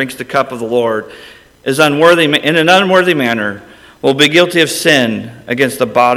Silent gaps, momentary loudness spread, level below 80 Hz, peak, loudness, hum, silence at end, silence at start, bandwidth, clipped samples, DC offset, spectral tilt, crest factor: none; 13 LU; -54 dBFS; 0 dBFS; -11 LUFS; none; 0 s; 0 s; 18.5 kHz; 0.3%; under 0.1%; -4 dB/octave; 12 dB